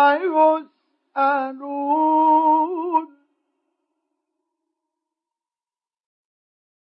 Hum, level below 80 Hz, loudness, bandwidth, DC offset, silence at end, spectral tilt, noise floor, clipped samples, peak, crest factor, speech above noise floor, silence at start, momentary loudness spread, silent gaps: none; under -90 dBFS; -19 LUFS; 5.4 kHz; under 0.1%; 3.8 s; -7 dB/octave; under -90 dBFS; under 0.1%; -6 dBFS; 16 dB; over 72 dB; 0 s; 11 LU; none